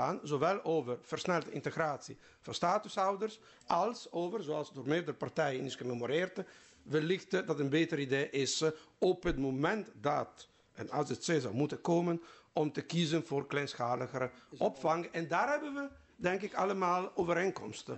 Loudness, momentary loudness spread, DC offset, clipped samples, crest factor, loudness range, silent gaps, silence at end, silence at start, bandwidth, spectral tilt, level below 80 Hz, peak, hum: -35 LUFS; 8 LU; under 0.1%; under 0.1%; 16 dB; 2 LU; none; 0 s; 0 s; 8.2 kHz; -5 dB/octave; -60 dBFS; -18 dBFS; none